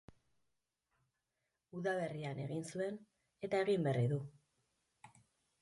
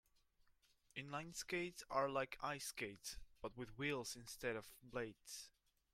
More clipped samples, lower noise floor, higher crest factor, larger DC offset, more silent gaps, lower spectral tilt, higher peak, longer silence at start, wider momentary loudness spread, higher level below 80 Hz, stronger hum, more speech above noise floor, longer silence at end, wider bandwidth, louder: neither; first, -88 dBFS vs -76 dBFS; about the same, 18 dB vs 22 dB; neither; neither; first, -7 dB/octave vs -3.5 dB/octave; about the same, -24 dBFS vs -26 dBFS; first, 1.75 s vs 0.5 s; first, 16 LU vs 11 LU; second, -78 dBFS vs -70 dBFS; neither; first, 50 dB vs 29 dB; about the same, 0.55 s vs 0.45 s; second, 11.5 kHz vs 16.5 kHz; first, -39 LUFS vs -47 LUFS